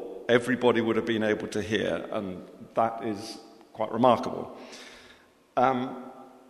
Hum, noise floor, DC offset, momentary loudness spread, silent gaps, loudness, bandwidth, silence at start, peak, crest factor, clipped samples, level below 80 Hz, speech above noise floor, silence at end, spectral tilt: none; -57 dBFS; under 0.1%; 20 LU; none; -27 LUFS; 13.5 kHz; 0 s; -6 dBFS; 22 dB; under 0.1%; -66 dBFS; 30 dB; 0.2 s; -5.5 dB/octave